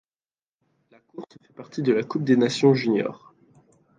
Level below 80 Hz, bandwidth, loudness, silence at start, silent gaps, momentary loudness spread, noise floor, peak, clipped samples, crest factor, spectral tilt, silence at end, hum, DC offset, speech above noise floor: -72 dBFS; 9.4 kHz; -22 LUFS; 1.2 s; none; 23 LU; under -90 dBFS; -6 dBFS; under 0.1%; 20 dB; -6.5 dB/octave; 0.8 s; none; under 0.1%; over 67 dB